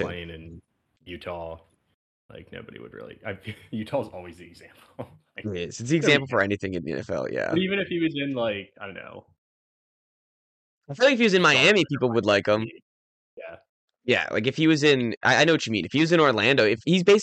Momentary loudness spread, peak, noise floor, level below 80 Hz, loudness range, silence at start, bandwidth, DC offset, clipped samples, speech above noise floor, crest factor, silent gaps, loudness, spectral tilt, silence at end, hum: 23 LU; -6 dBFS; -57 dBFS; -62 dBFS; 15 LU; 0 s; 9.2 kHz; under 0.1%; under 0.1%; 33 dB; 20 dB; 1.94-2.29 s, 9.38-10.81 s, 12.82-13.37 s, 13.69-13.88 s, 15.17-15.21 s; -22 LUFS; -5 dB/octave; 0 s; none